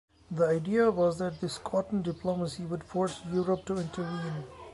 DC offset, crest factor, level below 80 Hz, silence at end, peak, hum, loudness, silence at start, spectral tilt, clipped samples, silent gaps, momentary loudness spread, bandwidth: under 0.1%; 16 dB; -58 dBFS; 0 s; -14 dBFS; none; -31 LUFS; 0.3 s; -6.5 dB/octave; under 0.1%; none; 10 LU; 11.5 kHz